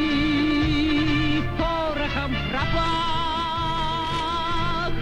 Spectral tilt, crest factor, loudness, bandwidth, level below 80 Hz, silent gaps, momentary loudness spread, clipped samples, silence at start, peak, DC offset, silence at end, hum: -6 dB/octave; 12 dB; -24 LUFS; 10.5 kHz; -32 dBFS; none; 4 LU; under 0.1%; 0 s; -10 dBFS; under 0.1%; 0 s; none